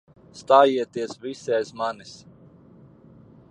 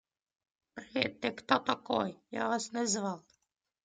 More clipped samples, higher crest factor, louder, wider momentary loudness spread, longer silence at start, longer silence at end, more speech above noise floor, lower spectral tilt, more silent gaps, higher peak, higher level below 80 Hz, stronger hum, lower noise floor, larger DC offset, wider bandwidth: neither; about the same, 22 dB vs 24 dB; first, -22 LUFS vs -33 LUFS; first, 23 LU vs 11 LU; second, 0.35 s vs 0.75 s; first, 1.35 s vs 0.65 s; second, 28 dB vs 46 dB; first, -4.5 dB/octave vs -3 dB/octave; neither; first, -2 dBFS vs -10 dBFS; first, -68 dBFS vs -76 dBFS; neither; second, -50 dBFS vs -79 dBFS; neither; about the same, 10 kHz vs 9.8 kHz